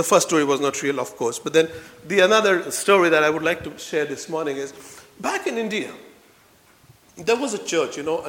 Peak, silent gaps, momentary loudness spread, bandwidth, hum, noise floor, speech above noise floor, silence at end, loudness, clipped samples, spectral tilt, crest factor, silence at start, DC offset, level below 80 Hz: -2 dBFS; none; 12 LU; 18 kHz; none; -55 dBFS; 33 dB; 0 s; -21 LUFS; under 0.1%; -3 dB/octave; 20 dB; 0 s; under 0.1%; -64 dBFS